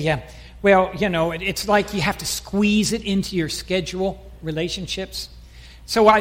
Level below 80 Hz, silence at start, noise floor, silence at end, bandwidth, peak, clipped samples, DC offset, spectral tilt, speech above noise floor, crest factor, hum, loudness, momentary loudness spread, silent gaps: -42 dBFS; 0 s; -42 dBFS; 0 s; 16.5 kHz; -2 dBFS; under 0.1%; under 0.1%; -4.5 dB/octave; 22 dB; 18 dB; none; -21 LUFS; 12 LU; none